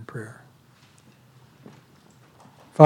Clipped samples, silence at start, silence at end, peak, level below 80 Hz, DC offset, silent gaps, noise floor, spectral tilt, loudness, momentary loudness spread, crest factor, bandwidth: under 0.1%; 0.15 s; 0 s; 0 dBFS; -76 dBFS; under 0.1%; none; -55 dBFS; -9 dB/octave; -46 LUFS; 16 LU; 24 dB; 18 kHz